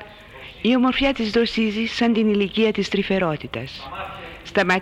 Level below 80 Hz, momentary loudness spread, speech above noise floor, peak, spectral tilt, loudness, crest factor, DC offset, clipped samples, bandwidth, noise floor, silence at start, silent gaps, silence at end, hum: -46 dBFS; 15 LU; 21 dB; -8 dBFS; -5.5 dB/octave; -21 LUFS; 14 dB; under 0.1%; under 0.1%; 9.8 kHz; -41 dBFS; 0 s; none; 0 s; none